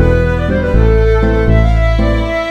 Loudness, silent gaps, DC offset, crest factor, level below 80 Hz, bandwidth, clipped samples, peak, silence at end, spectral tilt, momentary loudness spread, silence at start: -12 LUFS; none; under 0.1%; 10 dB; -14 dBFS; 6.6 kHz; 0.1%; 0 dBFS; 0 s; -8 dB/octave; 3 LU; 0 s